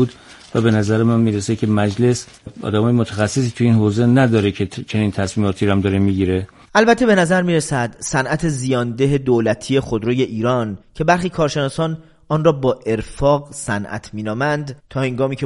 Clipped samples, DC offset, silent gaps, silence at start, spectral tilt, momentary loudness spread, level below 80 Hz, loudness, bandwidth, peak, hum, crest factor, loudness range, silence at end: under 0.1%; under 0.1%; none; 0 s; -6 dB/octave; 9 LU; -44 dBFS; -18 LUFS; 11.5 kHz; 0 dBFS; none; 18 dB; 3 LU; 0 s